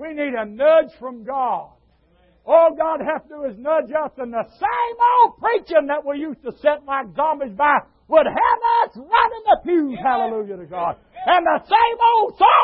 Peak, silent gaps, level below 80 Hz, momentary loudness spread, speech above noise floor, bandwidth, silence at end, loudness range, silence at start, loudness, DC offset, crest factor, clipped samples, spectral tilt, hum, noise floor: -2 dBFS; none; -56 dBFS; 12 LU; 39 dB; 5.4 kHz; 0 s; 3 LU; 0 s; -19 LUFS; under 0.1%; 16 dB; under 0.1%; -9 dB/octave; none; -57 dBFS